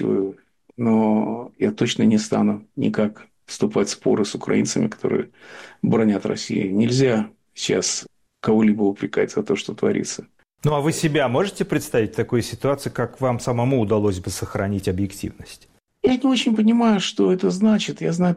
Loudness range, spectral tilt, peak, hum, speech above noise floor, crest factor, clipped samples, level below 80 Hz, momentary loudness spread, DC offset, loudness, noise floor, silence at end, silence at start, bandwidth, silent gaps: 2 LU; -5.5 dB/octave; -8 dBFS; none; 22 dB; 14 dB; under 0.1%; -52 dBFS; 10 LU; under 0.1%; -21 LUFS; -42 dBFS; 0 s; 0 s; 15 kHz; none